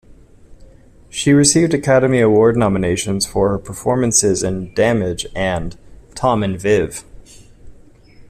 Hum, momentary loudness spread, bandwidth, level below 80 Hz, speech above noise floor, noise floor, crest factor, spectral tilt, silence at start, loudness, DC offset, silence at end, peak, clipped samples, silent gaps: none; 10 LU; 14.5 kHz; -40 dBFS; 28 dB; -43 dBFS; 16 dB; -4.5 dB/octave; 0.1 s; -16 LUFS; under 0.1%; 0.1 s; 0 dBFS; under 0.1%; none